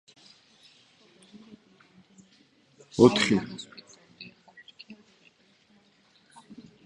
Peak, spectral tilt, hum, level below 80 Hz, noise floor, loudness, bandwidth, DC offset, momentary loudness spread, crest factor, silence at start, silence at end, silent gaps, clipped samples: -4 dBFS; -5 dB/octave; none; -64 dBFS; -63 dBFS; -23 LUFS; 11 kHz; under 0.1%; 31 LU; 28 dB; 2.95 s; 1.9 s; none; under 0.1%